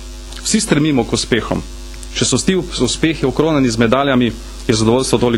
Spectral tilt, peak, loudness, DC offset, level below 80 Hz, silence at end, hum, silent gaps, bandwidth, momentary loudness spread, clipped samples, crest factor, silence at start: -4.5 dB/octave; 0 dBFS; -15 LUFS; under 0.1%; -32 dBFS; 0 s; none; none; 16 kHz; 10 LU; under 0.1%; 16 dB; 0 s